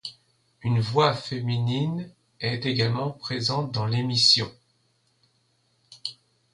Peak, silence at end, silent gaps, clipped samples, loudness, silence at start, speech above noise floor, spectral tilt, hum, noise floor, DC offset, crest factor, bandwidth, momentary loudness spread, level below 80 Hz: -6 dBFS; 0.4 s; none; under 0.1%; -24 LUFS; 0.05 s; 44 dB; -5 dB/octave; none; -68 dBFS; under 0.1%; 20 dB; 11.5 kHz; 18 LU; -60 dBFS